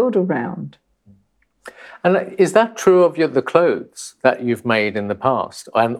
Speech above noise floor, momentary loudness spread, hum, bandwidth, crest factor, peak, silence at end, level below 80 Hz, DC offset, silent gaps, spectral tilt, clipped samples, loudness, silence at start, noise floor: 44 dB; 12 LU; none; 13.5 kHz; 18 dB; 0 dBFS; 0 s; -64 dBFS; under 0.1%; none; -5.5 dB/octave; under 0.1%; -18 LUFS; 0 s; -62 dBFS